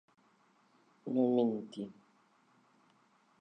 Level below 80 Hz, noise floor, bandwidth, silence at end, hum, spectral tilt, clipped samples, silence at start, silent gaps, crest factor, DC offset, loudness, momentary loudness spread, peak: -90 dBFS; -70 dBFS; 9 kHz; 1.5 s; none; -8.5 dB/octave; under 0.1%; 1.05 s; none; 20 dB; under 0.1%; -34 LUFS; 17 LU; -18 dBFS